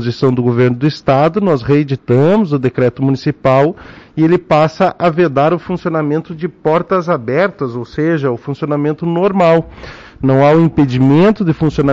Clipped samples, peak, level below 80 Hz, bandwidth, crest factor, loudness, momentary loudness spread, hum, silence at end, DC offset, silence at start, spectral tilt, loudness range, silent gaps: under 0.1%; -2 dBFS; -42 dBFS; 7.6 kHz; 10 dB; -13 LUFS; 8 LU; none; 0 s; under 0.1%; 0 s; -8.5 dB/octave; 3 LU; none